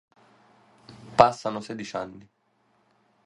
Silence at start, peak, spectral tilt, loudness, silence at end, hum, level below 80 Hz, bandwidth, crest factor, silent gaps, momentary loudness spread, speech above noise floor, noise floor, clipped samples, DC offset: 1.1 s; 0 dBFS; -5 dB/octave; -25 LUFS; 1.05 s; none; -60 dBFS; 11 kHz; 28 dB; none; 15 LU; 44 dB; -68 dBFS; under 0.1%; under 0.1%